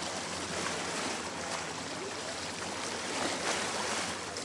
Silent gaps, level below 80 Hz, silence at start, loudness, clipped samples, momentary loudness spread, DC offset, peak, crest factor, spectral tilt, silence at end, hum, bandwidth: none; -68 dBFS; 0 s; -34 LUFS; under 0.1%; 5 LU; under 0.1%; -18 dBFS; 18 dB; -2 dB/octave; 0 s; none; 11.5 kHz